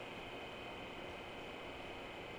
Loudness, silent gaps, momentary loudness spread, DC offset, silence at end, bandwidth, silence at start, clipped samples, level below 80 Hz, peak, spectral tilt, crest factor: -48 LUFS; none; 0 LU; under 0.1%; 0 s; over 20 kHz; 0 s; under 0.1%; -64 dBFS; -36 dBFS; -4.5 dB/octave; 14 dB